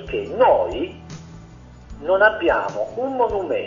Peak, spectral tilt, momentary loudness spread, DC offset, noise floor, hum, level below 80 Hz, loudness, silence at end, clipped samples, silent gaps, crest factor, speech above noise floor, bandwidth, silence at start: -2 dBFS; -6 dB/octave; 17 LU; under 0.1%; -42 dBFS; none; -44 dBFS; -20 LUFS; 0 s; under 0.1%; none; 18 dB; 23 dB; 7.4 kHz; 0 s